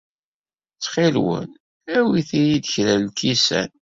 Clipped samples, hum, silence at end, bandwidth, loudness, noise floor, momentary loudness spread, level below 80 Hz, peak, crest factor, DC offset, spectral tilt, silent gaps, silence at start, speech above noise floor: under 0.1%; none; 0.25 s; 7.8 kHz; -20 LUFS; under -90 dBFS; 8 LU; -56 dBFS; -4 dBFS; 16 dB; under 0.1%; -4.5 dB/octave; 1.60-1.81 s; 0.8 s; over 71 dB